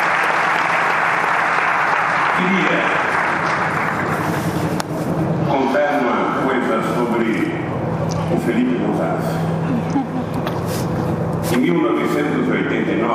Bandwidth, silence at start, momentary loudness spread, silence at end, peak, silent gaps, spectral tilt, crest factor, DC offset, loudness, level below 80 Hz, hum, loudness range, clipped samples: 15.5 kHz; 0 s; 6 LU; 0 s; -2 dBFS; none; -6 dB/octave; 16 dB; under 0.1%; -18 LUFS; -48 dBFS; none; 4 LU; under 0.1%